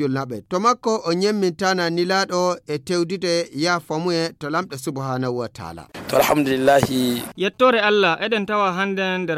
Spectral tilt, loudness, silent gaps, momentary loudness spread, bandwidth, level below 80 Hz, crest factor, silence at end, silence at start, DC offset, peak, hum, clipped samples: -4.5 dB/octave; -20 LUFS; none; 10 LU; 16.5 kHz; -56 dBFS; 18 dB; 0 s; 0 s; under 0.1%; -2 dBFS; none; under 0.1%